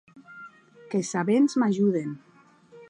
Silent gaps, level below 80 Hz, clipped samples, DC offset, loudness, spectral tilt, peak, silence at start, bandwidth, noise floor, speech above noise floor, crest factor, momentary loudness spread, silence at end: none; -76 dBFS; under 0.1%; under 0.1%; -25 LUFS; -6 dB/octave; -12 dBFS; 0.15 s; 11 kHz; -54 dBFS; 30 dB; 16 dB; 23 LU; 0.05 s